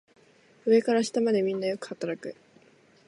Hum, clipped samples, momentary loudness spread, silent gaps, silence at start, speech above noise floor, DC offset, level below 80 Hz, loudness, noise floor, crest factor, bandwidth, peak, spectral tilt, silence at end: none; under 0.1%; 12 LU; none; 0.65 s; 34 dB; under 0.1%; -78 dBFS; -27 LUFS; -59 dBFS; 18 dB; 11.5 kHz; -10 dBFS; -5 dB/octave; 0.75 s